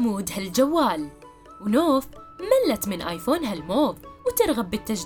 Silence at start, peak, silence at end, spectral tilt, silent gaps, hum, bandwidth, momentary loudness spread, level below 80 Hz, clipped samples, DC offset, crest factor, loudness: 0 s; -6 dBFS; 0 s; -4.5 dB/octave; none; none; 18 kHz; 10 LU; -50 dBFS; under 0.1%; under 0.1%; 18 dB; -24 LUFS